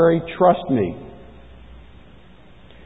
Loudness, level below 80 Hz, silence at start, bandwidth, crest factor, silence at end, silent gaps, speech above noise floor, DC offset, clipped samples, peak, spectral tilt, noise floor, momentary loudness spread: -19 LUFS; -46 dBFS; 0 s; 4 kHz; 20 dB; 1.75 s; none; 30 dB; 0.4%; under 0.1%; -2 dBFS; -10.5 dB/octave; -47 dBFS; 21 LU